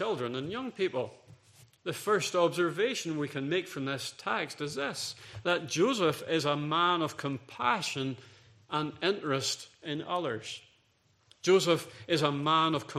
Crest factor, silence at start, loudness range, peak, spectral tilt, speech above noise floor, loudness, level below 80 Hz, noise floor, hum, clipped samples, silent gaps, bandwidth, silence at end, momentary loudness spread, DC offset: 22 dB; 0 s; 3 LU; -10 dBFS; -4 dB/octave; 38 dB; -31 LUFS; -74 dBFS; -69 dBFS; none; under 0.1%; none; 14.5 kHz; 0 s; 11 LU; under 0.1%